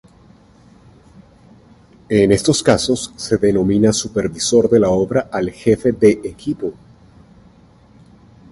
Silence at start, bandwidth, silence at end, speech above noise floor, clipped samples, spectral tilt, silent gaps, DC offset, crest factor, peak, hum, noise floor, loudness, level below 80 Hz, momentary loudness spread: 2.1 s; 11.5 kHz; 1.8 s; 32 dB; under 0.1%; -5 dB/octave; none; under 0.1%; 18 dB; 0 dBFS; none; -48 dBFS; -16 LUFS; -44 dBFS; 10 LU